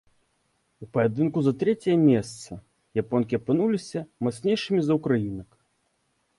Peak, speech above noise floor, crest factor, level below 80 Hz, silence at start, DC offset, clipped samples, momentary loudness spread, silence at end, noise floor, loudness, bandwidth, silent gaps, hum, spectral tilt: -10 dBFS; 48 dB; 16 dB; -60 dBFS; 0.8 s; under 0.1%; under 0.1%; 15 LU; 0.95 s; -72 dBFS; -25 LUFS; 11.5 kHz; none; none; -7 dB/octave